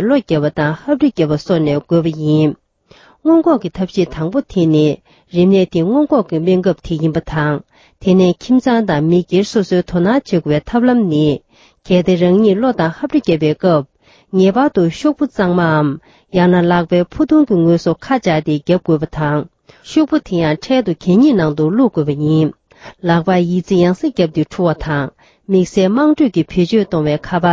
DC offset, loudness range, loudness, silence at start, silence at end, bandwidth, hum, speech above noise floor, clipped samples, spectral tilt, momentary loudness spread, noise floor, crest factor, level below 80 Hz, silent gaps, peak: under 0.1%; 2 LU; -14 LUFS; 0 s; 0 s; 7.8 kHz; none; 34 dB; under 0.1%; -7.5 dB/octave; 6 LU; -47 dBFS; 14 dB; -42 dBFS; none; 0 dBFS